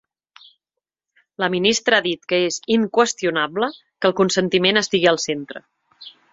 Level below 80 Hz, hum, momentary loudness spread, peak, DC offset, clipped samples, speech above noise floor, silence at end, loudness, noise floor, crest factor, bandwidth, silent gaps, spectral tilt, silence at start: -62 dBFS; none; 9 LU; -2 dBFS; under 0.1%; under 0.1%; 65 dB; 0.25 s; -19 LUFS; -85 dBFS; 20 dB; 8 kHz; none; -3.5 dB/octave; 1.4 s